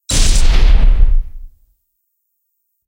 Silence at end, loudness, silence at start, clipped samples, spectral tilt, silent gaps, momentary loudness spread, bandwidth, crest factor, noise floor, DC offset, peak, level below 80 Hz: 1.4 s; -15 LUFS; 0.1 s; under 0.1%; -3.5 dB/octave; none; 9 LU; 11.5 kHz; 12 dB; -69 dBFS; under 0.1%; 0 dBFS; -12 dBFS